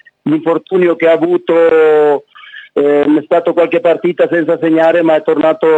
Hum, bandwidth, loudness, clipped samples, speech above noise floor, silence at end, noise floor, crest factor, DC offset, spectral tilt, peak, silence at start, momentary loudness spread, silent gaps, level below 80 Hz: none; 7.8 kHz; -11 LUFS; under 0.1%; 25 dB; 0 s; -35 dBFS; 10 dB; under 0.1%; -8 dB/octave; 0 dBFS; 0.25 s; 5 LU; none; -68 dBFS